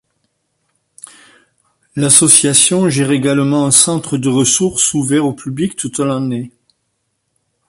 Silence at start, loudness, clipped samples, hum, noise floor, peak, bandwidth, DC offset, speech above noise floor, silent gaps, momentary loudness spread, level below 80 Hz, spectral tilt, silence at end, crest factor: 1.95 s; -12 LUFS; 0.1%; none; -68 dBFS; 0 dBFS; 16 kHz; under 0.1%; 55 dB; none; 13 LU; -54 dBFS; -3.5 dB/octave; 1.2 s; 16 dB